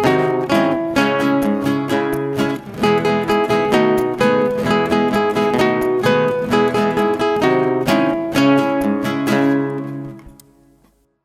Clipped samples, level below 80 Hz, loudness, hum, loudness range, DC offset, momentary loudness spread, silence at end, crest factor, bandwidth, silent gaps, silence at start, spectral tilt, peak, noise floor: under 0.1%; -48 dBFS; -17 LUFS; none; 2 LU; under 0.1%; 5 LU; 0.95 s; 16 dB; 16 kHz; none; 0 s; -6 dB/octave; -2 dBFS; -56 dBFS